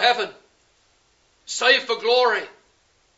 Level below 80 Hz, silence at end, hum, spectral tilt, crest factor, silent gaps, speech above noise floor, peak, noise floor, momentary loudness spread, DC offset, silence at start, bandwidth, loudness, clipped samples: -74 dBFS; 0.7 s; none; 0 dB/octave; 20 dB; none; 42 dB; -4 dBFS; -62 dBFS; 14 LU; under 0.1%; 0 s; 8 kHz; -20 LUFS; under 0.1%